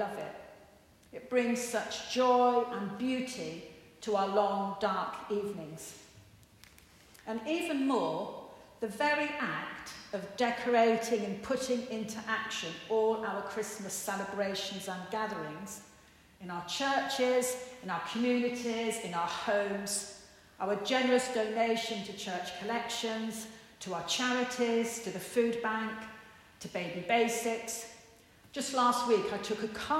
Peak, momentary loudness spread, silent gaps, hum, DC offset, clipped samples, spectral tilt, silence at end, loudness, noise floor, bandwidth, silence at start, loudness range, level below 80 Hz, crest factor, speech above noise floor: -16 dBFS; 15 LU; none; none; under 0.1%; under 0.1%; -3.5 dB/octave; 0 s; -33 LUFS; -60 dBFS; 16 kHz; 0 s; 4 LU; -70 dBFS; 18 dB; 27 dB